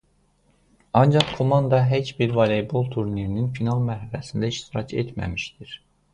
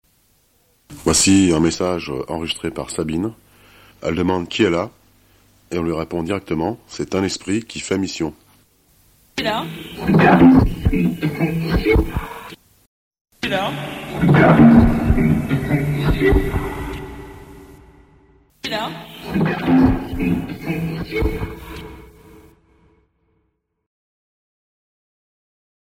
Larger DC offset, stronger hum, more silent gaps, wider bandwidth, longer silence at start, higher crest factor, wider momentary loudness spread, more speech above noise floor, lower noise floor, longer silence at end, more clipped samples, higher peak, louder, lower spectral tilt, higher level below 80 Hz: neither; neither; second, none vs 12.86-13.11 s, 13.21-13.25 s; second, 10 kHz vs 16 kHz; about the same, 0.95 s vs 0.9 s; about the same, 22 dB vs 18 dB; second, 12 LU vs 17 LU; second, 41 dB vs 52 dB; second, -63 dBFS vs -69 dBFS; second, 0.4 s vs 3.8 s; neither; about the same, 0 dBFS vs 0 dBFS; second, -23 LUFS vs -18 LUFS; first, -7 dB/octave vs -5.5 dB/octave; second, -48 dBFS vs -32 dBFS